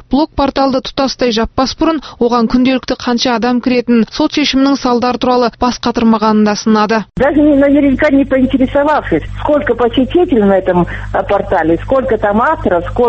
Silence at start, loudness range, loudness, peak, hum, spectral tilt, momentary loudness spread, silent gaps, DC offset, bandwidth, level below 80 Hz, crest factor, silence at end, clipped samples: 0.1 s; 2 LU; -12 LUFS; 0 dBFS; none; -5.5 dB/octave; 5 LU; none; under 0.1%; 6.4 kHz; -32 dBFS; 12 dB; 0 s; under 0.1%